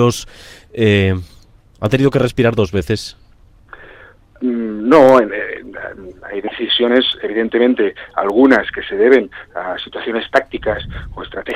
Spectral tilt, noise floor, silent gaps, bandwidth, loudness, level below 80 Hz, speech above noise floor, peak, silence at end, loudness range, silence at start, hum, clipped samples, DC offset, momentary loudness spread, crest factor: -6 dB/octave; -43 dBFS; none; 15.5 kHz; -15 LUFS; -42 dBFS; 28 dB; 0 dBFS; 0 s; 4 LU; 0 s; none; under 0.1%; under 0.1%; 17 LU; 16 dB